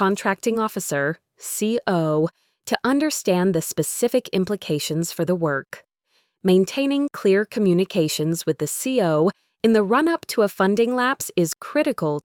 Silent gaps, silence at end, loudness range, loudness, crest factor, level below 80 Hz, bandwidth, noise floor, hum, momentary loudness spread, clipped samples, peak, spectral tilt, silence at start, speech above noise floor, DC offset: none; 0.05 s; 2 LU; -21 LUFS; 18 dB; -64 dBFS; 19.5 kHz; -68 dBFS; none; 6 LU; under 0.1%; -2 dBFS; -5 dB/octave; 0 s; 47 dB; under 0.1%